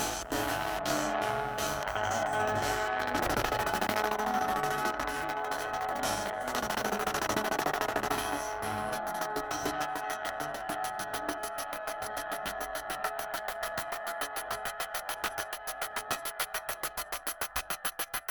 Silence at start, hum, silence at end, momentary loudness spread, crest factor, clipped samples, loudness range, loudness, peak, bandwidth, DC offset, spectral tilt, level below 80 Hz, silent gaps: 0 s; none; 0 s; 6 LU; 20 dB; under 0.1%; 5 LU; -33 LUFS; -12 dBFS; 19.5 kHz; under 0.1%; -2.5 dB/octave; -54 dBFS; none